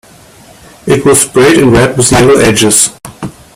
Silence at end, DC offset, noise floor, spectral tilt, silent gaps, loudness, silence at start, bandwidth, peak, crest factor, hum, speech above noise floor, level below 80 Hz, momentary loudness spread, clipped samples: 0.25 s; under 0.1%; -37 dBFS; -4 dB/octave; none; -6 LUFS; 0.85 s; over 20 kHz; 0 dBFS; 8 dB; none; 31 dB; -32 dBFS; 18 LU; 0.4%